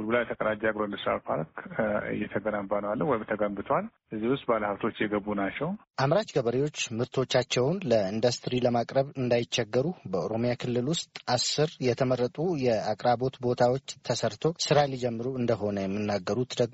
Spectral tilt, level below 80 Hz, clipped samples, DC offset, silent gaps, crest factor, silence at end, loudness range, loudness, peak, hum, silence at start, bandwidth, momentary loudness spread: -4.5 dB/octave; -60 dBFS; under 0.1%; under 0.1%; none; 18 dB; 0 s; 3 LU; -28 LUFS; -10 dBFS; none; 0 s; 8 kHz; 6 LU